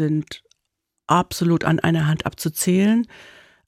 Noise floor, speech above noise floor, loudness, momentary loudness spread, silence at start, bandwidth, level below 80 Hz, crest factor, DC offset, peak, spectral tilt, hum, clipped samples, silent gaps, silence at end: -78 dBFS; 58 dB; -20 LUFS; 10 LU; 0 s; 16 kHz; -52 dBFS; 18 dB; under 0.1%; -4 dBFS; -5.5 dB/octave; none; under 0.1%; none; 0.5 s